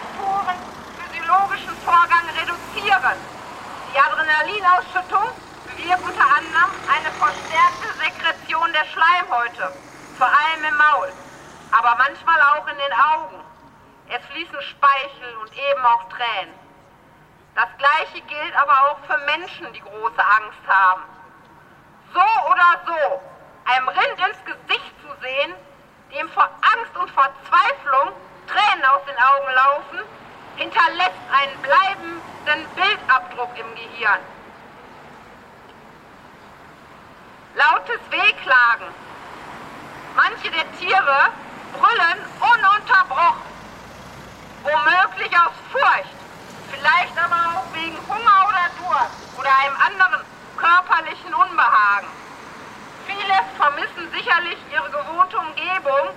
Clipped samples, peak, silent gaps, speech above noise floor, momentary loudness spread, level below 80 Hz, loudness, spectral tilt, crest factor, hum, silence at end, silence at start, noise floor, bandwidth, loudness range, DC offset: under 0.1%; -2 dBFS; none; 31 dB; 19 LU; -60 dBFS; -18 LUFS; -2.5 dB/octave; 18 dB; none; 0 s; 0 s; -50 dBFS; 14 kHz; 5 LU; under 0.1%